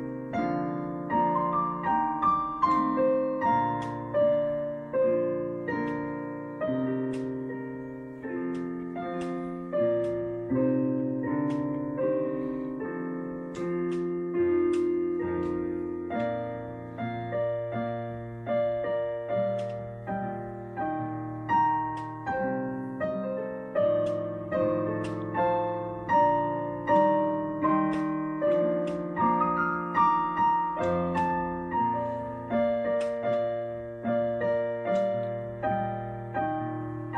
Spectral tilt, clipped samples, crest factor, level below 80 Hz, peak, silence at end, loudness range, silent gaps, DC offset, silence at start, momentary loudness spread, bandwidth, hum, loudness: -8.5 dB/octave; under 0.1%; 16 dB; -58 dBFS; -12 dBFS; 0 s; 5 LU; none; under 0.1%; 0 s; 9 LU; 9.6 kHz; none; -29 LUFS